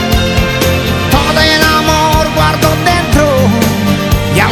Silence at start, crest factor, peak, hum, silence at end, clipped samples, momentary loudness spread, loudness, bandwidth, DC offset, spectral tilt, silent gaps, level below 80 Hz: 0 s; 10 dB; 0 dBFS; none; 0 s; 0.7%; 4 LU; -10 LUFS; 20 kHz; under 0.1%; -4.5 dB/octave; none; -20 dBFS